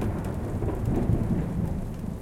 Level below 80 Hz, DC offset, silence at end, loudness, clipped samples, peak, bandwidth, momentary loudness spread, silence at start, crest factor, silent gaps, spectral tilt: -34 dBFS; under 0.1%; 0 s; -29 LUFS; under 0.1%; -12 dBFS; 16 kHz; 6 LU; 0 s; 16 dB; none; -9 dB/octave